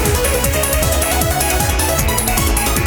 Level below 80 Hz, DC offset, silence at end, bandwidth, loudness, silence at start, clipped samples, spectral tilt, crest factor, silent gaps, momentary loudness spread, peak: -22 dBFS; under 0.1%; 0 s; over 20 kHz; -15 LUFS; 0 s; under 0.1%; -3.5 dB/octave; 14 dB; none; 0 LU; 0 dBFS